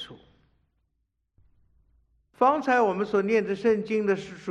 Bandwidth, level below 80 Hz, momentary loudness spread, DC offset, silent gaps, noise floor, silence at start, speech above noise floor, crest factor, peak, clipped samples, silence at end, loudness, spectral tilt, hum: 8.6 kHz; -66 dBFS; 5 LU; under 0.1%; none; -77 dBFS; 0 s; 53 dB; 20 dB; -8 dBFS; under 0.1%; 0 s; -25 LUFS; -6.5 dB/octave; none